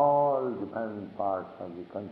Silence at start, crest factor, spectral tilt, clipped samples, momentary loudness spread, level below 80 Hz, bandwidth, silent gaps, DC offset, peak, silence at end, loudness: 0 s; 16 dB; -10.5 dB/octave; under 0.1%; 15 LU; -74 dBFS; 4.7 kHz; none; under 0.1%; -12 dBFS; 0 s; -31 LUFS